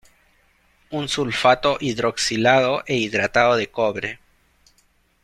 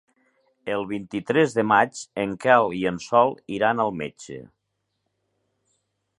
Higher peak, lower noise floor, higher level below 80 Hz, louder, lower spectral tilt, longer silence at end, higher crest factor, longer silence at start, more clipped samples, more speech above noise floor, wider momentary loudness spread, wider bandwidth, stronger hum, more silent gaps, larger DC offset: about the same, -2 dBFS vs -2 dBFS; second, -62 dBFS vs -77 dBFS; first, -54 dBFS vs -62 dBFS; about the same, -20 LUFS vs -22 LUFS; second, -4 dB/octave vs -5.5 dB/octave; second, 1.1 s vs 1.7 s; about the same, 20 dB vs 22 dB; first, 0.9 s vs 0.65 s; neither; second, 42 dB vs 55 dB; second, 12 LU vs 15 LU; first, 13.5 kHz vs 11.5 kHz; neither; neither; neither